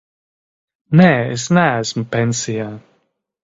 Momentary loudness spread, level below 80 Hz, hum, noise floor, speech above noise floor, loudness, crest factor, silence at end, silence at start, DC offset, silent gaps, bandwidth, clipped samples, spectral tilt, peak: 12 LU; -52 dBFS; none; -66 dBFS; 50 dB; -16 LUFS; 18 dB; 0.65 s; 0.9 s; under 0.1%; none; 7.8 kHz; under 0.1%; -5.5 dB/octave; 0 dBFS